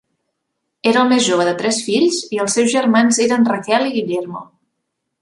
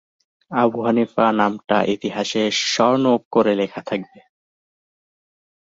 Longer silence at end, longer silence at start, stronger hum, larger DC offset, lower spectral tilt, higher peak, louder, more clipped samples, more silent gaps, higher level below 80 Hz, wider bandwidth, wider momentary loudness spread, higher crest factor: second, 0.75 s vs 1.7 s; first, 0.85 s vs 0.5 s; neither; neither; about the same, -3.5 dB/octave vs -4.5 dB/octave; about the same, -2 dBFS vs -2 dBFS; first, -16 LUFS vs -19 LUFS; neither; second, none vs 3.25-3.31 s; about the same, -64 dBFS vs -64 dBFS; first, 11.5 kHz vs 7.8 kHz; about the same, 8 LU vs 8 LU; about the same, 14 dB vs 18 dB